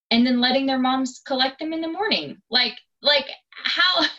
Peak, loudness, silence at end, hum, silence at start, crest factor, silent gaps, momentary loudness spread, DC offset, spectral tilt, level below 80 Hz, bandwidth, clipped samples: -6 dBFS; -21 LUFS; 0 s; none; 0.1 s; 16 dB; none; 9 LU; under 0.1%; -3 dB/octave; -66 dBFS; 8 kHz; under 0.1%